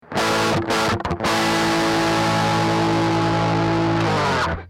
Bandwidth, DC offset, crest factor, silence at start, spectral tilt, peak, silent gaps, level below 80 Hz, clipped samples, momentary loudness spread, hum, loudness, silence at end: 16.5 kHz; under 0.1%; 10 dB; 0.1 s; -5 dB/octave; -10 dBFS; none; -42 dBFS; under 0.1%; 2 LU; none; -19 LUFS; 0 s